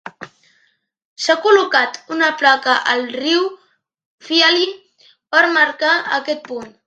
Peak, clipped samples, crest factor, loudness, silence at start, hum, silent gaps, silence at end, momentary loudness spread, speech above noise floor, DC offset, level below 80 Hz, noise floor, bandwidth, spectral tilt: 0 dBFS; under 0.1%; 18 dB; -15 LUFS; 0.05 s; none; 1.05-1.16 s, 4.06-4.18 s; 0.15 s; 11 LU; 46 dB; under 0.1%; -70 dBFS; -62 dBFS; 9 kHz; -1.5 dB/octave